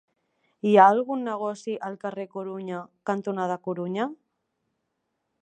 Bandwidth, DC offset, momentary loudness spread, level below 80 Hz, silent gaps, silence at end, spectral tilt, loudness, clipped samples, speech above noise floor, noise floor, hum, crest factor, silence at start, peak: 9.2 kHz; under 0.1%; 17 LU; -80 dBFS; none; 1.25 s; -6.5 dB/octave; -25 LUFS; under 0.1%; 54 dB; -79 dBFS; none; 24 dB; 0.65 s; -2 dBFS